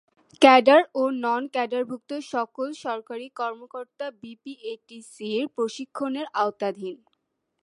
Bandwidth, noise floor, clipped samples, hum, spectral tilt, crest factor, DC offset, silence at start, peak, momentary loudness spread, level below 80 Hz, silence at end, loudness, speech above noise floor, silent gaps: 11.5 kHz; -76 dBFS; under 0.1%; none; -4 dB/octave; 24 dB; under 0.1%; 0.4 s; -2 dBFS; 21 LU; -80 dBFS; 0.65 s; -24 LUFS; 52 dB; none